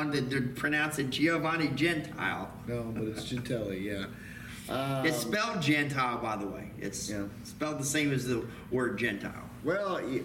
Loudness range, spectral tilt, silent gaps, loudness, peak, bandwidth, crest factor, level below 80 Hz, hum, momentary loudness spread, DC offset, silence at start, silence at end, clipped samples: 3 LU; -4.5 dB/octave; none; -32 LUFS; -16 dBFS; 17 kHz; 16 dB; -56 dBFS; none; 10 LU; under 0.1%; 0 s; 0 s; under 0.1%